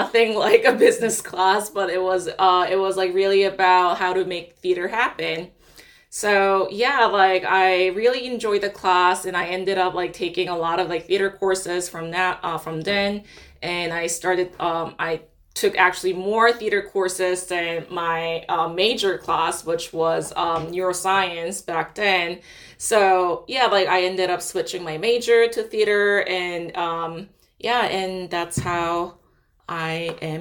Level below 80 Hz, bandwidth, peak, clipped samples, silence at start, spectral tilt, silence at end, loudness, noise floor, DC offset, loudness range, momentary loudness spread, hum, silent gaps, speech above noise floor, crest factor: -56 dBFS; 18 kHz; 0 dBFS; under 0.1%; 0 s; -3 dB/octave; 0 s; -21 LUFS; -53 dBFS; under 0.1%; 5 LU; 10 LU; none; none; 32 dB; 20 dB